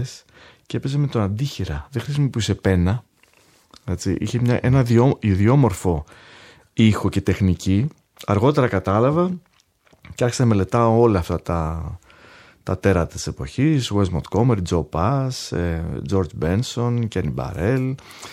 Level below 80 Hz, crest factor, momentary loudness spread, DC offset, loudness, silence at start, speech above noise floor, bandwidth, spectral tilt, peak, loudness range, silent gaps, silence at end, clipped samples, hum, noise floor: -40 dBFS; 18 dB; 12 LU; under 0.1%; -21 LUFS; 0 s; 38 dB; 14.5 kHz; -7 dB/octave; -2 dBFS; 4 LU; none; 0 s; under 0.1%; none; -58 dBFS